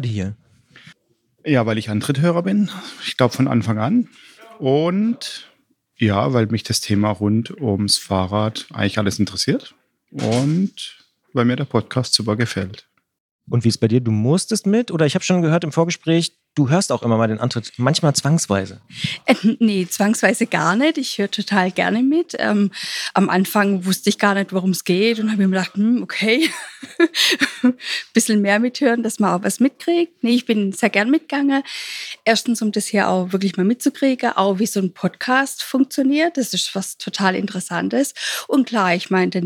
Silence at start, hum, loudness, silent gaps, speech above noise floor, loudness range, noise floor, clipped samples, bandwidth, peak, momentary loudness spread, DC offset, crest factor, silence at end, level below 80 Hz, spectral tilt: 0 s; none; -19 LUFS; 13.20-13.39 s; 46 dB; 3 LU; -64 dBFS; under 0.1%; 17.5 kHz; -2 dBFS; 7 LU; under 0.1%; 18 dB; 0 s; -62 dBFS; -5 dB/octave